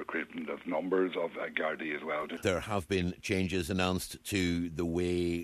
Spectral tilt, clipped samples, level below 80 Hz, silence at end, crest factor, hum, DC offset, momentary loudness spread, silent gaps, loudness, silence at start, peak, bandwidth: -5 dB/octave; under 0.1%; -56 dBFS; 0 s; 20 dB; none; under 0.1%; 5 LU; none; -33 LUFS; 0 s; -14 dBFS; 14 kHz